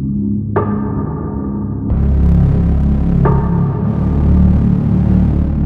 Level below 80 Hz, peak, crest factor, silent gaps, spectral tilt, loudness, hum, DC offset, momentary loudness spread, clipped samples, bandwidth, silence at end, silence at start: -18 dBFS; 0 dBFS; 12 dB; none; -12 dB/octave; -14 LUFS; none; under 0.1%; 8 LU; under 0.1%; 3.3 kHz; 0 s; 0 s